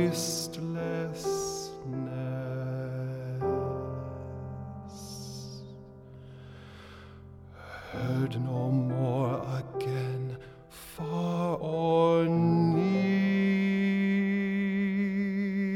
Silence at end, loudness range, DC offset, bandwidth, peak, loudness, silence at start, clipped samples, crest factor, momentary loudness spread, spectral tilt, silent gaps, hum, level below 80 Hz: 0 s; 16 LU; under 0.1%; 15.5 kHz; -14 dBFS; -30 LUFS; 0 s; under 0.1%; 16 dB; 23 LU; -6.5 dB/octave; none; none; -58 dBFS